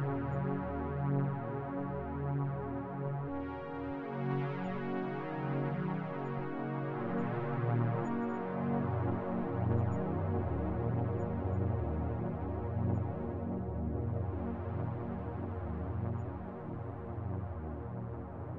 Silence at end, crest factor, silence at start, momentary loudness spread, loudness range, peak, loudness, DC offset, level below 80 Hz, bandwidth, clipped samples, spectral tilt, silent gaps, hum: 0 s; 16 dB; 0 s; 7 LU; 4 LU; -20 dBFS; -37 LUFS; under 0.1%; -52 dBFS; 4.5 kHz; under 0.1%; -10.5 dB/octave; none; none